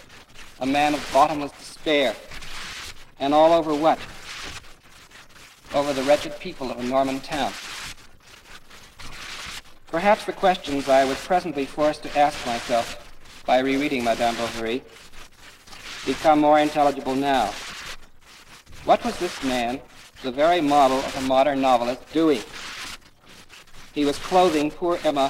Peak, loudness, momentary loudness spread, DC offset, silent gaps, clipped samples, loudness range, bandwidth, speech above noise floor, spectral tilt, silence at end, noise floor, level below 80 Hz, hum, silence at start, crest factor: -6 dBFS; -22 LUFS; 17 LU; under 0.1%; none; under 0.1%; 5 LU; 16 kHz; 27 dB; -4 dB/octave; 0 s; -48 dBFS; -46 dBFS; none; 0.1 s; 18 dB